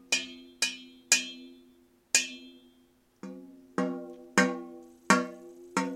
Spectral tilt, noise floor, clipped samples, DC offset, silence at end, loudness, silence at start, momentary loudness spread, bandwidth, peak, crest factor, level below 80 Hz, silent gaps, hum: -2 dB/octave; -65 dBFS; under 0.1%; under 0.1%; 0 s; -29 LUFS; 0.1 s; 22 LU; 16.5 kHz; -4 dBFS; 28 dB; -76 dBFS; none; none